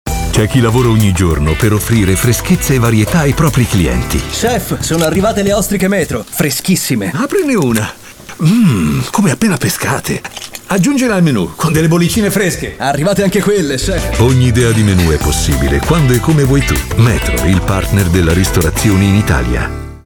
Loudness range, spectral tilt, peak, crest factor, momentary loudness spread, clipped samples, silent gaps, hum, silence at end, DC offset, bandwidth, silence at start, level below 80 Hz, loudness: 2 LU; -5.5 dB/octave; 0 dBFS; 10 dB; 5 LU; under 0.1%; none; none; 0.05 s; under 0.1%; over 20 kHz; 0.05 s; -24 dBFS; -12 LUFS